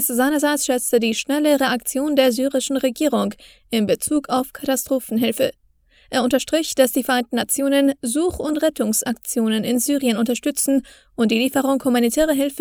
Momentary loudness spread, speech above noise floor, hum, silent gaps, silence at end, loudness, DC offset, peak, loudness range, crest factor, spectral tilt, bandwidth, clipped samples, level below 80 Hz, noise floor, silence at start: 5 LU; 36 dB; none; none; 0 s; -20 LUFS; under 0.1%; -2 dBFS; 2 LU; 18 dB; -3 dB/octave; over 20 kHz; under 0.1%; -52 dBFS; -56 dBFS; 0 s